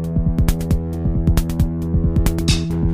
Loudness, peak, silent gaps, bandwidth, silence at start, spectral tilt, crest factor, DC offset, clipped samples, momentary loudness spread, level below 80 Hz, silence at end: -19 LUFS; -2 dBFS; none; 16 kHz; 0 s; -6.5 dB/octave; 14 dB; under 0.1%; under 0.1%; 3 LU; -22 dBFS; 0 s